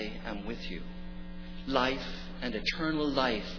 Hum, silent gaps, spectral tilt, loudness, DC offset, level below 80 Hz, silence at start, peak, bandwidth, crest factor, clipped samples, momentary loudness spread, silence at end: none; none; -5.5 dB/octave; -33 LUFS; under 0.1%; -42 dBFS; 0 s; -12 dBFS; 5.4 kHz; 20 dB; under 0.1%; 16 LU; 0 s